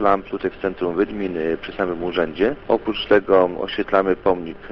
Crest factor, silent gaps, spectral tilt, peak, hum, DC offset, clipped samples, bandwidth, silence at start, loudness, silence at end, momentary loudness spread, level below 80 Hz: 16 dB; none; -8 dB/octave; -4 dBFS; none; under 0.1%; under 0.1%; 6 kHz; 0 s; -21 LUFS; 0 s; 8 LU; -46 dBFS